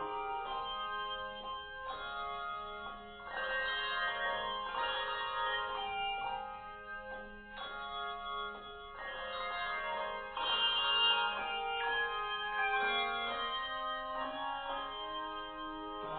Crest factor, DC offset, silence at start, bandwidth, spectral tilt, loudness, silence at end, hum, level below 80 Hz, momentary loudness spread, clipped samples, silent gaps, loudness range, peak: 18 dB; under 0.1%; 0 s; 4.6 kHz; 2 dB/octave; -37 LUFS; 0 s; none; -60 dBFS; 13 LU; under 0.1%; none; 8 LU; -20 dBFS